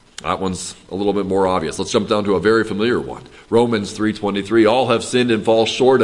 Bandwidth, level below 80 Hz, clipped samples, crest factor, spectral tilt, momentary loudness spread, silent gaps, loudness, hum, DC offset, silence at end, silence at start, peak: 11.5 kHz; -50 dBFS; under 0.1%; 16 dB; -5 dB/octave; 9 LU; none; -18 LUFS; none; under 0.1%; 0 s; 0.2 s; -2 dBFS